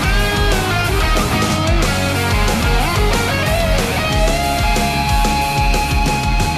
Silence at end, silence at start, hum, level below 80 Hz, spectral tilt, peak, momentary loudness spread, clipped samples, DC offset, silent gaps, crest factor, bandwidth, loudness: 0 s; 0 s; none; -20 dBFS; -4.5 dB/octave; -4 dBFS; 1 LU; under 0.1%; under 0.1%; none; 12 dB; 14 kHz; -16 LUFS